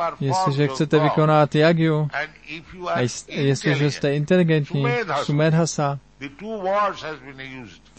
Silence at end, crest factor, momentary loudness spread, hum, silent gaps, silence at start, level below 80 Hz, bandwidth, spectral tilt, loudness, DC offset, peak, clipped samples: 0.25 s; 16 dB; 18 LU; none; none; 0 s; -56 dBFS; 8.8 kHz; -6 dB/octave; -21 LUFS; 0.1%; -4 dBFS; under 0.1%